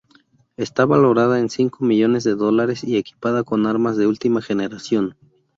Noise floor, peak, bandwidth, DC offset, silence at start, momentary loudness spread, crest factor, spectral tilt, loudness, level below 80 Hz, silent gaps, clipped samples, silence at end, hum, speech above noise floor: -56 dBFS; -2 dBFS; 7.8 kHz; under 0.1%; 0.6 s; 8 LU; 16 dB; -6.5 dB/octave; -19 LUFS; -60 dBFS; none; under 0.1%; 0.45 s; none; 38 dB